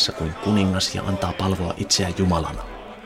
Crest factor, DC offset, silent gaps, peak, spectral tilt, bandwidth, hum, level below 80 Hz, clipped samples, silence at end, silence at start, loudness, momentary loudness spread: 16 dB; under 0.1%; none; -6 dBFS; -4.5 dB/octave; 16 kHz; none; -40 dBFS; under 0.1%; 0 s; 0 s; -22 LUFS; 8 LU